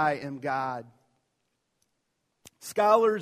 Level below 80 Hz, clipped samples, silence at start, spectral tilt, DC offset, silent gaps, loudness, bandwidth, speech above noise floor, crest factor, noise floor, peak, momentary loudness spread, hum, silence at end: -76 dBFS; under 0.1%; 0 s; -5 dB/octave; under 0.1%; none; -27 LUFS; 15 kHz; 52 dB; 20 dB; -78 dBFS; -8 dBFS; 17 LU; none; 0 s